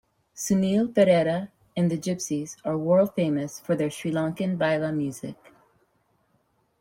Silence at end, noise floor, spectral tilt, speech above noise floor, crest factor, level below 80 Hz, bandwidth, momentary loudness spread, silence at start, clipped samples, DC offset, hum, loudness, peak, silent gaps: 1.45 s; -69 dBFS; -6 dB/octave; 44 dB; 20 dB; -64 dBFS; 16.5 kHz; 11 LU; 0.35 s; under 0.1%; under 0.1%; none; -25 LUFS; -6 dBFS; none